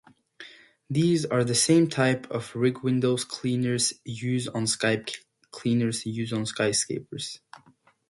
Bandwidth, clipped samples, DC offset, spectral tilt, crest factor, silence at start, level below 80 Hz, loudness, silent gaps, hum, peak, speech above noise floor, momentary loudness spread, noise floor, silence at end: 11.5 kHz; under 0.1%; under 0.1%; -4.5 dB/octave; 18 dB; 0.4 s; -64 dBFS; -26 LUFS; none; none; -8 dBFS; 24 dB; 15 LU; -49 dBFS; 0.75 s